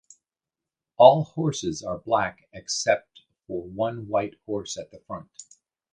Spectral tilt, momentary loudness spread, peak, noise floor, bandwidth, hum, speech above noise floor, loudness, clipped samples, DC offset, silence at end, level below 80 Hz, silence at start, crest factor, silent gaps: -4.5 dB/octave; 21 LU; -2 dBFS; -89 dBFS; 10 kHz; none; 65 dB; -24 LUFS; under 0.1%; under 0.1%; 0.5 s; -60 dBFS; 1 s; 24 dB; none